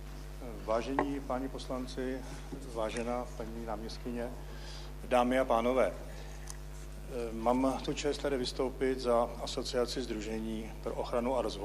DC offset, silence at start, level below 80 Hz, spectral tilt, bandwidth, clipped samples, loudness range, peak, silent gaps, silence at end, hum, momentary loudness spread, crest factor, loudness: under 0.1%; 0 s; -46 dBFS; -5 dB/octave; 15.5 kHz; under 0.1%; 6 LU; -14 dBFS; none; 0 s; none; 15 LU; 20 dB; -34 LUFS